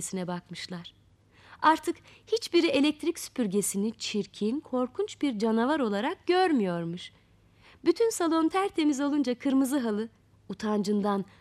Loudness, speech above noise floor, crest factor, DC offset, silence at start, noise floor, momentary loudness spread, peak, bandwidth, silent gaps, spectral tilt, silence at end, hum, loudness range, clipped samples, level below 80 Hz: -28 LUFS; 31 dB; 18 dB; under 0.1%; 0 s; -59 dBFS; 12 LU; -10 dBFS; 14.5 kHz; none; -4.5 dB/octave; 0.15 s; none; 1 LU; under 0.1%; -68 dBFS